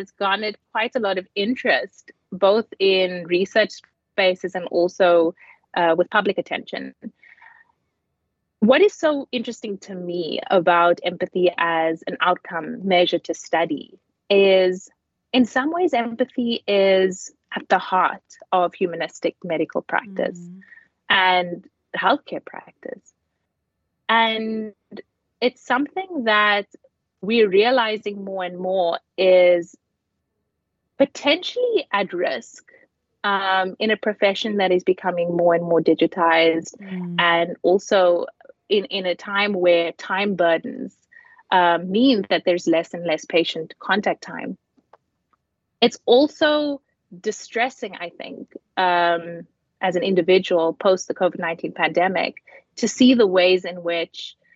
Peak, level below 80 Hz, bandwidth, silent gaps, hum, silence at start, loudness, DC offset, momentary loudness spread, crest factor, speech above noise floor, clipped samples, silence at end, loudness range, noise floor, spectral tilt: -4 dBFS; -74 dBFS; 7.8 kHz; none; none; 0 s; -20 LUFS; under 0.1%; 15 LU; 18 dB; 56 dB; under 0.1%; 0.25 s; 4 LU; -76 dBFS; -4.5 dB/octave